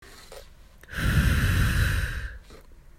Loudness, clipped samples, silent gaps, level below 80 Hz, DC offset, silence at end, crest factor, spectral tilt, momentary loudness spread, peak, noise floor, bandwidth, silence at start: -25 LUFS; under 0.1%; none; -30 dBFS; under 0.1%; 0.25 s; 16 dB; -5 dB/octave; 23 LU; -10 dBFS; -49 dBFS; 16 kHz; 0 s